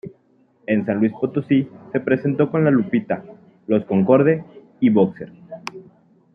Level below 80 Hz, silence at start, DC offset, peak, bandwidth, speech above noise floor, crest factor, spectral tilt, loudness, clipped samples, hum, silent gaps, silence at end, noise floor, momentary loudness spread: -64 dBFS; 0.05 s; under 0.1%; -2 dBFS; 6.4 kHz; 40 dB; 18 dB; -9 dB/octave; -19 LUFS; under 0.1%; none; none; 0.55 s; -58 dBFS; 19 LU